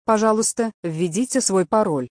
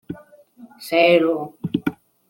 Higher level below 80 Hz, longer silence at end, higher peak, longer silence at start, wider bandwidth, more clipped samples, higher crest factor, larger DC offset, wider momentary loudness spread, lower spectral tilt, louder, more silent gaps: about the same, -60 dBFS vs -62 dBFS; second, 0 s vs 0.35 s; about the same, -4 dBFS vs -2 dBFS; about the same, 0.1 s vs 0.1 s; second, 11 kHz vs 17 kHz; neither; about the same, 16 dB vs 18 dB; neither; second, 7 LU vs 22 LU; second, -4.5 dB/octave vs -6 dB/octave; about the same, -20 LUFS vs -19 LUFS; first, 0.74-0.83 s vs none